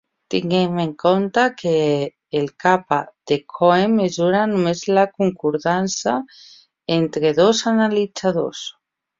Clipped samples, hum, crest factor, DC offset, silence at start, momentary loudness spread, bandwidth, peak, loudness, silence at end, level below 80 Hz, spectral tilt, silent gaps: under 0.1%; none; 18 dB; under 0.1%; 0.3 s; 8 LU; 7.8 kHz; -2 dBFS; -19 LUFS; 0.5 s; -60 dBFS; -5 dB/octave; none